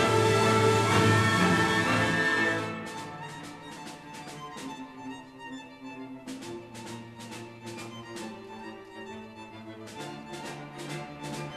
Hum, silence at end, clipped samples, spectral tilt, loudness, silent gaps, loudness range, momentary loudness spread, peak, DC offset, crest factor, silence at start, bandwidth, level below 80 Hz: none; 0 s; under 0.1%; -4.5 dB/octave; -25 LUFS; none; 17 LU; 20 LU; -10 dBFS; under 0.1%; 20 dB; 0 s; 14 kHz; -60 dBFS